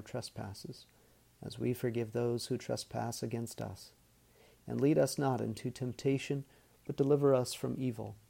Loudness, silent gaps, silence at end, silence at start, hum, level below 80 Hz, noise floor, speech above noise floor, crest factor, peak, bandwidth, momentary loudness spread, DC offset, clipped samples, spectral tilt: -35 LUFS; none; 0.15 s; 0 s; none; -68 dBFS; -65 dBFS; 30 dB; 18 dB; -16 dBFS; 16.5 kHz; 20 LU; under 0.1%; under 0.1%; -6 dB/octave